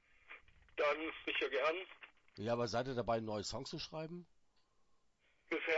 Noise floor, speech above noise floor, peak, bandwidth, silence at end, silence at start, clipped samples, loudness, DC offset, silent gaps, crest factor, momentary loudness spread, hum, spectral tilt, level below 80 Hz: -75 dBFS; 36 dB; -22 dBFS; 7.6 kHz; 0 s; 0.3 s; under 0.1%; -40 LUFS; under 0.1%; none; 20 dB; 21 LU; none; -3 dB/octave; -68 dBFS